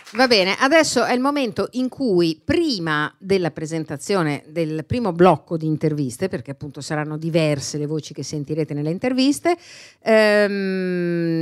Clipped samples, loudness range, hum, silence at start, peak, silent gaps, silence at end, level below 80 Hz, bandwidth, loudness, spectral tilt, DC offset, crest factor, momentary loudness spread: under 0.1%; 5 LU; none; 0.05 s; 0 dBFS; none; 0 s; -54 dBFS; 14 kHz; -20 LUFS; -5 dB/octave; under 0.1%; 20 dB; 11 LU